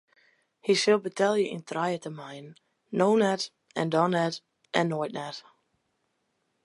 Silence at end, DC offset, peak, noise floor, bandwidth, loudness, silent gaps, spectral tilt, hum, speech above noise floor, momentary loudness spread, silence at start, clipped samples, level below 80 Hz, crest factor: 1.25 s; under 0.1%; -6 dBFS; -76 dBFS; 11.5 kHz; -27 LUFS; none; -5 dB/octave; none; 49 dB; 17 LU; 0.65 s; under 0.1%; -80 dBFS; 22 dB